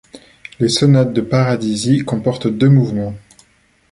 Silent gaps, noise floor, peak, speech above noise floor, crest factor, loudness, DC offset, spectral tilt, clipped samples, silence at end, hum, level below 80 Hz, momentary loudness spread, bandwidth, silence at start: none; -55 dBFS; -2 dBFS; 41 dB; 14 dB; -15 LUFS; under 0.1%; -6.5 dB/octave; under 0.1%; 0.7 s; none; -48 dBFS; 8 LU; 11.5 kHz; 0.15 s